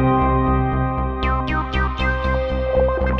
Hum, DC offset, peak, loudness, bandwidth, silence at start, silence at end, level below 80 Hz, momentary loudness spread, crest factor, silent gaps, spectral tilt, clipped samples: none; under 0.1%; -6 dBFS; -20 LUFS; 5.8 kHz; 0 s; 0 s; -24 dBFS; 4 LU; 12 dB; none; -8.5 dB/octave; under 0.1%